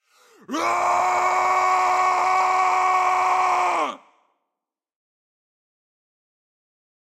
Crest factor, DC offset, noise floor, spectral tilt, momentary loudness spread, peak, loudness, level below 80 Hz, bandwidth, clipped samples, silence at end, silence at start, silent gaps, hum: 14 dB; under 0.1%; -85 dBFS; -1.5 dB/octave; 5 LU; -8 dBFS; -20 LUFS; -70 dBFS; 14.5 kHz; under 0.1%; 3.2 s; 0.5 s; none; none